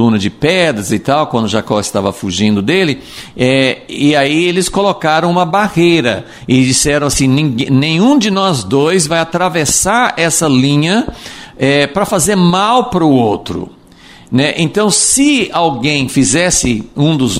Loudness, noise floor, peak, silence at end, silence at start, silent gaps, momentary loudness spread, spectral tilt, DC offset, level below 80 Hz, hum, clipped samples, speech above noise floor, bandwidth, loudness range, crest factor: -11 LUFS; -39 dBFS; 0 dBFS; 0 s; 0 s; none; 6 LU; -4 dB/octave; under 0.1%; -38 dBFS; none; under 0.1%; 27 dB; 16 kHz; 2 LU; 12 dB